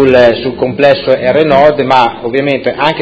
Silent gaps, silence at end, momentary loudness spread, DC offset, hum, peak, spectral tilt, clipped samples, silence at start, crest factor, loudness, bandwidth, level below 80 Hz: none; 0 s; 7 LU; under 0.1%; none; 0 dBFS; -7 dB/octave; 2%; 0 s; 8 dB; -9 LUFS; 8 kHz; -40 dBFS